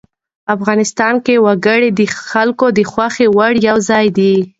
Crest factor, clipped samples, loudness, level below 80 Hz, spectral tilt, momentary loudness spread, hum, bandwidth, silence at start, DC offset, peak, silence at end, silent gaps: 12 dB; under 0.1%; -12 LUFS; -54 dBFS; -5 dB/octave; 5 LU; none; 8 kHz; 0.5 s; under 0.1%; 0 dBFS; 0.1 s; none